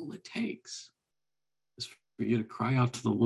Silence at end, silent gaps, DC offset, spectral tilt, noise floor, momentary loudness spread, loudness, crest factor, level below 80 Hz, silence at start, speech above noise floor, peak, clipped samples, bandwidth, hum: 0 s; none; under 0.1%; -6 dB/octave; under -90 dBFS; 14 LU; -33 LUFS; 20 dB; -70 dBFS; 0 s; over 59 dB; -14 dBFS; under 0.1%; 12 kHz; none